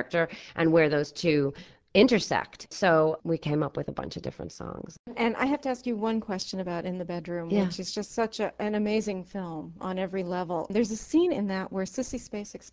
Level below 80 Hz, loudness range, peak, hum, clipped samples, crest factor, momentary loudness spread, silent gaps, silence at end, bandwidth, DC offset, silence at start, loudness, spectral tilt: -58 dBFS; 6 LU; -6 dBFS; none; under 0.1%; 22 dB; 14 LU; 4.99-5.04 s; 0.05 s; 8 kHz; under 0.1%; 0 s; -28 LUFS; -5.5 dB/octave